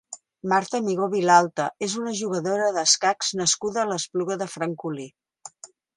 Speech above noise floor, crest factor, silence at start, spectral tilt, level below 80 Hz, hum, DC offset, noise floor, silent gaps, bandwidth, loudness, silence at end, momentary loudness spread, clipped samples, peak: 25 dB; 22 dB; 0.1 s; -2.5 dB/octave; -72 dBFS; none; under 0.1%; -49 dBFS; none; 11.5 kHz; -23 LUFS; 0.3 s; 16 LU; under 0.1%; -2 dBFS